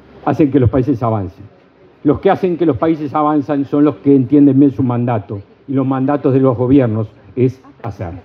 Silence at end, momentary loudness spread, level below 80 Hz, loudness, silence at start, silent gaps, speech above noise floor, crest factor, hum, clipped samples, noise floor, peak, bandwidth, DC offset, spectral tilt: 0.05 s; 13 LU; -46 dBFS; -14 LUFS; 0.25 s; none; 33 dB; 14 dB; none; under 0.1%; -46 dBFS; 0 dBFS; 5.2 kHz; under 0.1%; -10.5 dB/octave